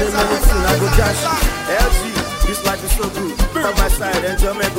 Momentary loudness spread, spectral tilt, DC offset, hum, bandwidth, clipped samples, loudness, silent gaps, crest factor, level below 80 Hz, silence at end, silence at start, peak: 5 LU; -4 dB/octave; under 0.1%; none; 16.5 kHz; under 0.1%; -17 LUFS; none; 16 dB; -18 dBFS; 0 s; 0 s; 0 dBFS